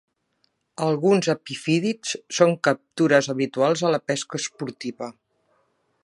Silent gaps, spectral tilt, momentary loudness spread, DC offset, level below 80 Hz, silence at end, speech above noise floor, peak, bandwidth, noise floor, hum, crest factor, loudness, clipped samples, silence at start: none; -4.5 dB/octave; 13 LU; under 0.1%; -72 dBFS; 0.9 s; 48 dB; -2 dBFS; 11.5 kHz; -70 dBFS; none; 22 dB; -23 LUFS; under 0.1%; 0.8 s